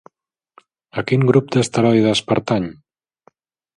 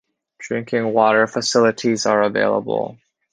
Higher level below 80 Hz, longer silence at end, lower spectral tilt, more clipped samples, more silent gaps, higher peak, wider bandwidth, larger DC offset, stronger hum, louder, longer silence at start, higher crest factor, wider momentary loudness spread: first, -56 dBFS vs -64 dBFS; first, 1.05 s vs 0.4 s; first, -6 dB/octave vs -4 dB/octave; neither; neither; about the same, 0 dBFS vs 0 dBFS; first, 11.5 kHz vs 10 kHz; neither; neither; about the same, -17 LUFS vs -18 LUFS; first, 0.95 s vs 0.4 s; about the same, 18 dB vs 18 dB; about the same, 12 LU vs 11 LU